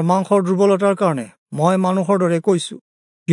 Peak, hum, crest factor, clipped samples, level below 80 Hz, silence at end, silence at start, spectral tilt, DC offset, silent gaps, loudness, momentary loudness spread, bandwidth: -2 dBFS; none; 16 dB; under 0.1%; -72 dBFS; 0 s; 0 s; -7 dB/octave; under 0.1%; 1.38-1.46 s, 2.81-3.26 s; -17 LUFS; 13 LU; 11 kHz